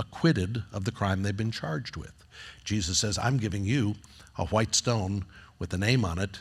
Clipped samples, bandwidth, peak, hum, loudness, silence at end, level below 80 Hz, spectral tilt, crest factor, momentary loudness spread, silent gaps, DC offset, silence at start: under 0.1%; 13.5 kHz; -10 dBFS; none; -28 LUFS; 0 s; -52 dBFS; -4.5 dB/octave; 18 dB; 16 LU; none; under 0.1%; 0 s